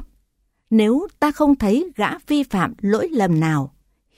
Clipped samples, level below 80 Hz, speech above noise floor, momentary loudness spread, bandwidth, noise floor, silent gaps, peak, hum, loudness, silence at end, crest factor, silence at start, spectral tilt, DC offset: under 0.1%; -46 dBFS; 49 dB; 6 LU; 15.5 kHz; -67 dBFS; none; -4 dBFS; none; -19 LUFS; 0.5 s; 16 dB; 0 s; -7 dB/octave; under 0.1%